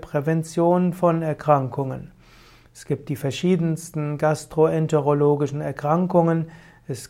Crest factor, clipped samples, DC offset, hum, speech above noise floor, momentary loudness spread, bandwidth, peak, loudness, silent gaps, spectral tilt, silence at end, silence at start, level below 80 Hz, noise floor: 18 dB; under 0.1%; under 0.1%; none; 29 dB; 10 LU; 15.5 kHz; -4 dBFS; -22 LUFS; none; -7.5 dB/octave; 0.05 s; 0 s; -56 dBFS; -50 dBFS